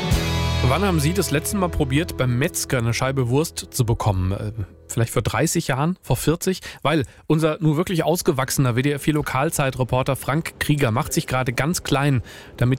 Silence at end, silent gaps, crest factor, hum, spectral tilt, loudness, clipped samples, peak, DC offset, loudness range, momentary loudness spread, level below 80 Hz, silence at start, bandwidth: 0 s; none; 14 dB; none; -5.5 dB/octave; -21 LUFS; under 0.1%; -8 dBFS; 0.2%; 2 LU; 4 LU; -36 dBFS; 0 s; 16.5 kHz